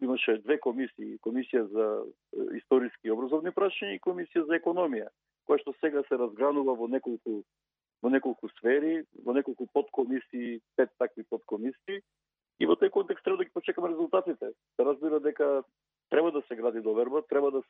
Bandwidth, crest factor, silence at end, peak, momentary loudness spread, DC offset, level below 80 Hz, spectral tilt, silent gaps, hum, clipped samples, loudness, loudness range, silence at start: 3.9 kHz; 18 dB; 0.1 s; -12 dBFS; 9 LU; under 0.1%; under -90 dBFS; -8.5 dB/octave; none; none; under 0.1%; -30 LUFS; 2 LU; 0 s